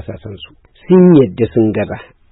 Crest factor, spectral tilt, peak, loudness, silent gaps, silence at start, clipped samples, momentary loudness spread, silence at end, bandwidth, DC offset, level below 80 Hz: 12 dB; -14 dB/octave; 0 dBFS; -11 LUFS; none; 0.1 s; under 0.1%; 22 LU; 0.3 s; 4 kHz; under 0.1%; -44 dBFS